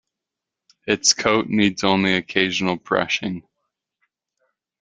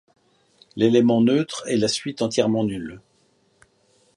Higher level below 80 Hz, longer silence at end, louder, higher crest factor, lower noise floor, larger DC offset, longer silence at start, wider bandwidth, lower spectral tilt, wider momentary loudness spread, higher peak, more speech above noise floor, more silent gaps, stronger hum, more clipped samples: about the same, -58 dBFS vs -60 dBFS; first, 1.4 s vs 1.2 s; about the same, -19 LUFS vs -21 LUFS; about the same, 22 dB vs 18 dB; first, -85 dBFS vs -63 dBFS; neither; about the same, 0.85 s vs 0.75 s; second, 9.6 kHz vs 11.5 kHz; second, -3 dB/octave vs -5.5 dB/octave; second, 9 LU vs 14 LU; first, 0 dBFS vs -4 dBFS; first, 65 dB vs 43 dB; neither; neither; neither